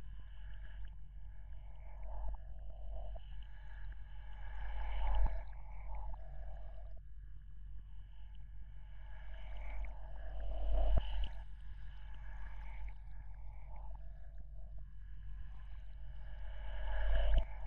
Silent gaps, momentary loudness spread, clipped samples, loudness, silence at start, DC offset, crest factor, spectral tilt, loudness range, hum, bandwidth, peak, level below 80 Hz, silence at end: none; 16 LU; under 0.1%; -48 LUFS; 0 s; under 0.1%; 18 dB; -5 dB/octave; 9 LU; none; 3.6 kHz; -20 dBFS; -42 dBFS; 0 s